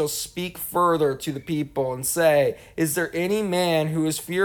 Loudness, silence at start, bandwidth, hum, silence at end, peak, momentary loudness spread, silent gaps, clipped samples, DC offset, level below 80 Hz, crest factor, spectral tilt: -23 LUFS; 0 s; over 20 kHz; none; 0 s; -8 dBFS; 9 LU; none; under 0.1%; under 0.1%; -56 dBFS; 16 dB; -4.5 dB/octave